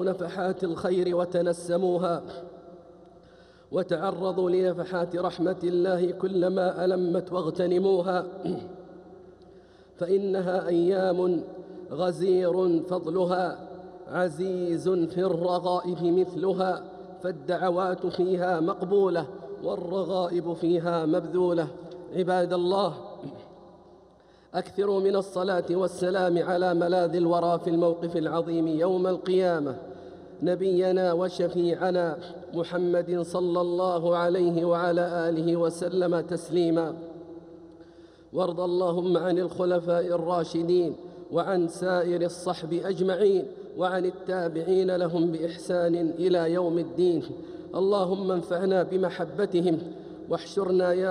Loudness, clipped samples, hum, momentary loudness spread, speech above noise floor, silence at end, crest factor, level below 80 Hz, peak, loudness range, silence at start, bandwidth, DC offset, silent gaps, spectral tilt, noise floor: -27 LUFS; under 0.1%; none; 10 LU; 30 dB; 0 s; 14 dB; -68 dBFS; -12 dBFS; 4 LU; 0 s; 11 kHz; under 0.1%; none; -7 dB/octave; -56 dBFS